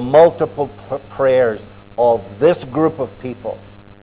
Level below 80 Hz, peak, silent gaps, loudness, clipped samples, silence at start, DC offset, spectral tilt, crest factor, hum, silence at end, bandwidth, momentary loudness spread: -48 dBFS; 0 dBFS; none; -17 LUFS; under 0.1%; 0 s; under 0.1%; -10.5 dB/octave; 16 dB; none; 0.45 s; 4 kHz; 16 LU